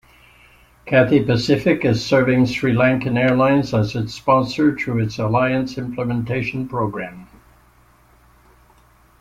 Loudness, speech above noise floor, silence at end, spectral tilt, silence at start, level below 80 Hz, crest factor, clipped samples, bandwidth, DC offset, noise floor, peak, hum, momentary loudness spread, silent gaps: -18 LUFS; 35 dB; 1.95 s; -7 dB/octave; 0.85 s; -48 dBFS; 18 dB; under 0.1%; 13.5 kHz; under 0.1%; -53 dBFS; -2 dBFS; none; 8 LU; none